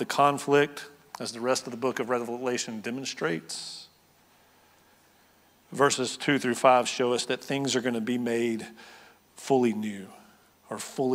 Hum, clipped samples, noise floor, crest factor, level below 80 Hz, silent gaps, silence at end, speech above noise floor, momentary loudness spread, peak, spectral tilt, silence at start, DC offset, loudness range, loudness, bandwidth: none; under 0.1%; -61 dBFS; 24 dB; -80 dBFS; none; 0 s; 34 dB; 18 LU; -4 dBFS; -4 dB/octave; 0 s; under 0.1%; 7 LU; -27 LUFS; 16 kHz